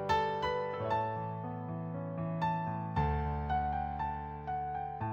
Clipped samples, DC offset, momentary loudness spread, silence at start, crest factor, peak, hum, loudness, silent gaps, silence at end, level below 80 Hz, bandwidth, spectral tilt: under 0.1%; under 0.1%; 7 LU; 0 s; 16 dB; -20 dBFS; none; -36 LUFS; none; 0 s; -46 dBFS; 18 kHz; -7.5 dB/octave